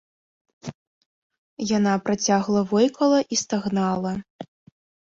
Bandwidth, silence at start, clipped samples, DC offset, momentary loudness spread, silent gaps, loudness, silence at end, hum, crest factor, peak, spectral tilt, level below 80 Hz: 7.6 kHz; 0.65 s; under 0.1%; under 0.1%; 20 LU; 0.75-1.30 s, 1.38-1.57 s, 4.30-4.39 s; -22 LUFS; 0.7 s; none; 16 dB; -8 dBFS; -5 dB/octave; -62 dBFS